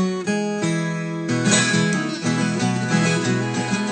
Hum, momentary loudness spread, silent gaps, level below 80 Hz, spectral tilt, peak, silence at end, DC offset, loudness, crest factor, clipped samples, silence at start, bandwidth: none; 7 LU; none; -62 dBFS; -4.5 dB/octave; -4 dBFS; 0 s; under 0.1%; -21 LUFS; 16 dB; under 0.1%; 0 s; 9.4 kHz